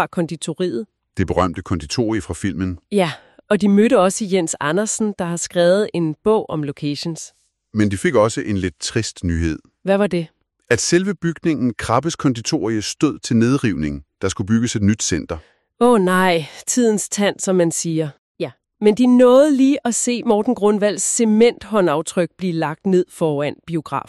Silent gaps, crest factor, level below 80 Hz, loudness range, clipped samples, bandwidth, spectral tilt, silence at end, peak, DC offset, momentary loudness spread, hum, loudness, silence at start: 18.18-18.35 s; 16 dB; -44 dBFS; 5 LU; under 0.1%; 13 kHz; -5 dB/octave; 0.1 s; -2 dBFS; under 0.1%; 11 LU; none; -18 LUFS; 0 s